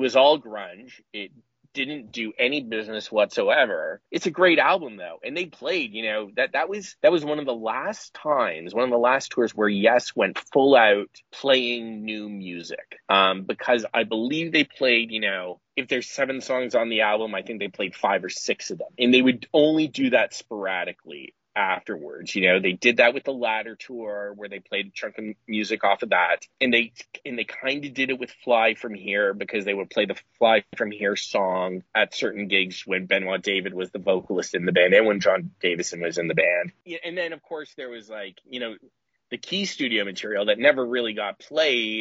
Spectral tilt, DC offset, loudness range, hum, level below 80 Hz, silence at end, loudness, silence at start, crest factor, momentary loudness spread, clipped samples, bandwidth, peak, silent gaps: -1.5 dB/octave; under 0.1%; 4 LU; none; -74 dBFS; 0 s; -23 LUFS; 0 s; 20 dB; 15 LU; under 0.1%; 8 kHz; -4 dBFS; none